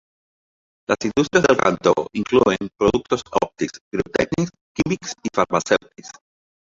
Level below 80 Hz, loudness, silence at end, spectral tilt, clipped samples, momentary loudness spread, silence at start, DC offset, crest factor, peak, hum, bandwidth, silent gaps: -48 dBFS; -20 LUFS; 0.7 s; -5 dB/octave; under 0.1%; 10 LU; 0.9 s; under 0.1%; 20 dB; -2 dBFS; none; 7.8 kHz; 3.81-3.91 s, 4.61-4.75 s